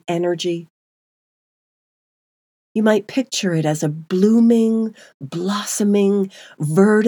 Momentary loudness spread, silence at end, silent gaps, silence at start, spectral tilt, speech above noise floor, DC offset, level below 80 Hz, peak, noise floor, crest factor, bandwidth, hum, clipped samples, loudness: 13 LU; 0 s; 0.70-2.75 s, 5.14-5.20 s; 0.1 s; -5.5 dB/octave; over 73 dB; under 0.1%; -78 dBFS; -2 dBFS; under -90 dBFS; 18 dB; 19 kHz; none; under 0.1%; -18 LUFS